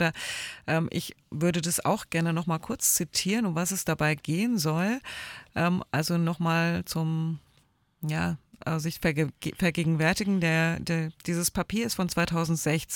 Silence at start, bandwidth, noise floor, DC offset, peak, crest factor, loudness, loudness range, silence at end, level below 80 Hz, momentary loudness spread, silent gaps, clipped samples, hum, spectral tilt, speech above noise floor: 0 s; 19 kHz; -66 dBFS; under 0.1%; -12 dBFS; 16 dB; -28 LUFS; 3 LU; 0 s; -54 dBFS; 8 LU; none; under 0.1%; none; -4.5 dB/octave; 38 dB